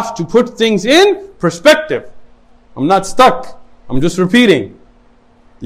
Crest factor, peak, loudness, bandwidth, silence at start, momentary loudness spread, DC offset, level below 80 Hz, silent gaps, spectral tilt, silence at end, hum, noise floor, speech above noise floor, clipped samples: 12 dB; 0 dBFS; -12 LUFS; 16.5 kHz; 0 s; 12 LU; under 0.1%; -38 dBFS; none; -4.5 dB/octave; 0 s; none; -46 dBFS; 35 dB; 0.3%